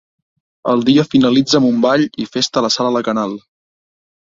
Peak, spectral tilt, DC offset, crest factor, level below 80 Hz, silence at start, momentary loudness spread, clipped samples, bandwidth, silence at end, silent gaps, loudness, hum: 0 dBFS; -5 dB/octave; under 0.1%; 14 dB; -54 dBFS; 0.65 s; 8 LU; under 0.1%; 7.8 kHz; 0.85 s; none; -15 LUFS; none